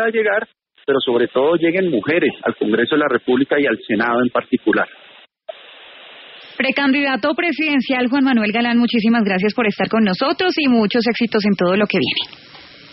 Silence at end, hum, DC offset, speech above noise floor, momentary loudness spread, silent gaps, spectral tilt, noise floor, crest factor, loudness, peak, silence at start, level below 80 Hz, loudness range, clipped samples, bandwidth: 0.3 s; none; under 0.1%; 24 dB; 8 LU; none; -3 dB/octave; -41 dBFS; 14 dB; -17 LUFS; -4 dBFS; 0 s; -60 dBFS; 4 LU; under 0.1%; 6 kHz